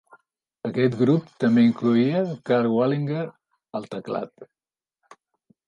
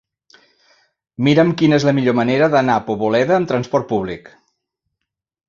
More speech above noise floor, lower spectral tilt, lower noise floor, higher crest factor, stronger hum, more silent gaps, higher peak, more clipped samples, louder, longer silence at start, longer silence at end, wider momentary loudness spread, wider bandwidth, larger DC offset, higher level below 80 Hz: second, 58 dB vs 63 dB; first, -8.5 dB/octave vs -7 dB/octave; about the same, -80 dBFS vs -79 dBFS; about the same, 16 dB vs 16 dB; neither; neither; second, -8 dBFS vs -2 dBFS; neither; second, -23 LUFS vs -16 LUFS; second, 0.65 s vs 1.2 s; about the same, 1.25 s vs 1.3 s; first, 16 LU vs 8 LU; about the same, 7 kHz vs 7.4 kHz; neither; second, -68 dBFS vs -54 dBFS